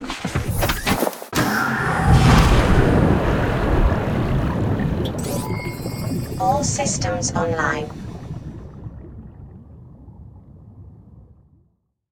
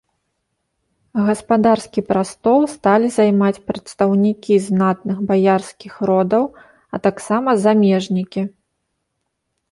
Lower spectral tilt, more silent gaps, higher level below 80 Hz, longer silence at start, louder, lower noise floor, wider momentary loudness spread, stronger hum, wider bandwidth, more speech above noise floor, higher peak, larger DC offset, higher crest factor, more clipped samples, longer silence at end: second, -5.5 dB/octave vs -7 dB/octave; neither; first, -28 dBFS vs -56 dBFS; second, 0 s vs 1.15 s; second, -20 LUFS vs -17 LUFS; second, -64 dBFS vs -74 dBFS; first, 18 LU vs 10 LU; neither; first, 17.5 kHz vs 11.5 kHz; second, 42 dB vs 58 dB; about the same, 0 dBFS vs -2 dBFS; neither; about the same, 20 dB vs 16 dB; neither; second, 0.9 s vs 1.25 s